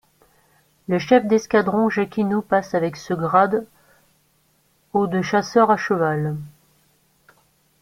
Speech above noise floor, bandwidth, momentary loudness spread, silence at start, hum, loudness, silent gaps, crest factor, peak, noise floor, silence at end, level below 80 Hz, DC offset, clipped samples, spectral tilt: 43 dB; 15.5 kHz; 9 LU; 0.9 s; none; -20 LUFS; none; 20 dB; -2 dBFS; -62 dBFS; 1.35 s; -60 dBFS; under 0.1%; under 0.1%; -6.5 dB/octave